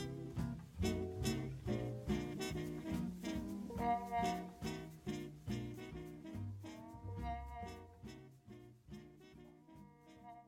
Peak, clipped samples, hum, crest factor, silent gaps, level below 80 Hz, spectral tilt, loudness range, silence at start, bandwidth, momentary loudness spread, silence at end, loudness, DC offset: -26 dBFS; under 0.1%; none; 20 dB; none; -56 dBFS; -6 dB/octave; 10 LU; 0 s; 17 kHz; 19 LU; 0 s; -44 LUFS; under 0.1%